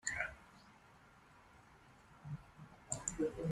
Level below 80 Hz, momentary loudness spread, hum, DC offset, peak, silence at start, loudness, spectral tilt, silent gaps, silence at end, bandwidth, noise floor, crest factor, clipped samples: -64 dBFS; 23 LU; none; under 0.1%; -22 dBFS; 0.05 s; -43 LUFS; -4 dB/octave; none; 0 s; 13 kHz; -64 dBFS; 26 dB; under 0.1%